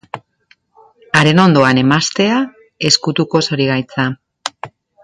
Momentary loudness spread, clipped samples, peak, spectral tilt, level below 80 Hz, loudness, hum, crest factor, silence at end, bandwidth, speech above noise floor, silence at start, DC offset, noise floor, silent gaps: 17 LU; under 0.1%; 0 dBFS; -4.5 dB/octave; -52 dBFS; -13 LUFS; none; 16 dB; 0.35 s; 11.5 kHz; 42 dB; 0.15 s; under 0.1%; -55 dBFS; none